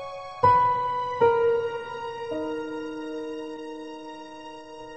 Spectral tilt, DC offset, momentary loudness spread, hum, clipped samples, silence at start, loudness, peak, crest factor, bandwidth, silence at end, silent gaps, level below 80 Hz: -6.5 dB/octave; 0.2%; 20 LU; none; under 0.1%; 0 s; -26 LUFS; -8 dBFS; 20 dB; 8.8 kHz; 0 s; none; -60 dBFS